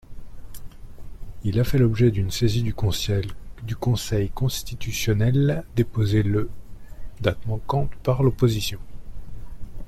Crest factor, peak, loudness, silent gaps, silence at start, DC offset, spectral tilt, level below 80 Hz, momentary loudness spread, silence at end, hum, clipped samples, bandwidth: 16 dB; -8 dBFS; -23 LUFS; none; 0.1 s; under 0.1%; -6.5 dB/octave; -36 dBFS; 23 LU; 0 s; none; under 0.1%; 15 kHz